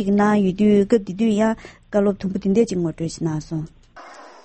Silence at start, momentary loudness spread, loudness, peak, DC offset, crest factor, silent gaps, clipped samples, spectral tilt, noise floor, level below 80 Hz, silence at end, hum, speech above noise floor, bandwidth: 0 s; 12 LU; -20 LUFS; -4 dBFS; under 0.1%; 16 dB; none; under 0.1%; -7 dB/octave; -42 dBFS; -48 dBFS; 0.15 s; none; 23 dB; 8.6 kHz